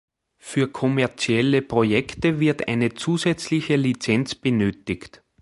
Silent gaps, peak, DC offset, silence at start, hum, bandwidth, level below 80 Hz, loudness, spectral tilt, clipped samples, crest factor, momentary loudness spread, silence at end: none; -4 dBFS; under 0.1%; 0.45 s; none; 11.5 kHz; -52 dBFS; -22 LUFS; -6 dB/octave; under 0.1%; 18 dB; 5 LU; 0.35 s